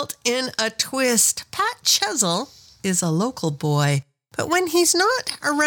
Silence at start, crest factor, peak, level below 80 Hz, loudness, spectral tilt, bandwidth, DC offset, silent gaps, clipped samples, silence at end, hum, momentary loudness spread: 0 s; 18 dB; -4 dBFS; -62 dBFS; -20 LUFS; -3 dB/octave; 19 kHz; under 0.1%; none; under 0.1%; 0 s; none; 9 LU